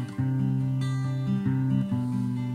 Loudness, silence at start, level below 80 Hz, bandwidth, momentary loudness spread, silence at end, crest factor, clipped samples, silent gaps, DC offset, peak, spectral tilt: -27 LUFS; 0 s; -58 dBFS; 9.6 kHz; 3 LU; 0 s; 12 dB; under 0.1%; none; under 0.1%; -14 dBFS; -8.5 dB/octave